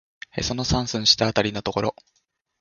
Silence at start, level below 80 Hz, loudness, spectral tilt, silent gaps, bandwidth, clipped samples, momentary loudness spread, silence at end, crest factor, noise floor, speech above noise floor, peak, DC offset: 0.35 s; -42 dBFS; -22 LUFS; -3.5 dB/octave; none; 7.4 kHz; under 0.1%; 11 LU; 0.7 s; 22 dB; -71 dBFS; 48 dB; -2 dBFS; under 0.1%